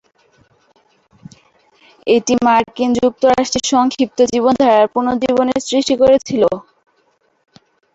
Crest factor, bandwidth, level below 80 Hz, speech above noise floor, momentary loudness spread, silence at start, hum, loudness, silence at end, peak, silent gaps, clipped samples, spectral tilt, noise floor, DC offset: 14 dB; 8.2 kHz; -50 dBFS; 47 dB; 5 LU; 2.05 s; none; -14 LUFS; 1.35 s; -2 dBFS; none; under 0.1%; -4 dB/octave; -60 dBFS; under 0.1%